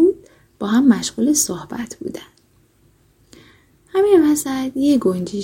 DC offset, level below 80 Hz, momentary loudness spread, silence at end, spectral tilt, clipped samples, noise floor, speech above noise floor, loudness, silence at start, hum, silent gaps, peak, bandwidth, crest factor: under 0.1%; -54 dBFS; 16 LU; 0 s; -4.5 dB/octave; under 0.1%; -56 dBFS; 39 dB; -17 LUFS; 0 s; none; none; -2 dBFS; 16.5 kHz; 16 dB